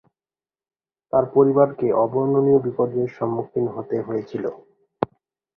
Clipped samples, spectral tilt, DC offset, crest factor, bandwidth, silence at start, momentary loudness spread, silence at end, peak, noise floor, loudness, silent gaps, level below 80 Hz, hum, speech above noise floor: under 0.1%; -11 dB/octave; under 0.1%; 20 dB; 4.4 kHz; 1.15 s; 12 LU; 0.5 s; -2 dBFS; under -90 dBFS; -21 LUFS; none; -62 dBFS; none; over 70 dB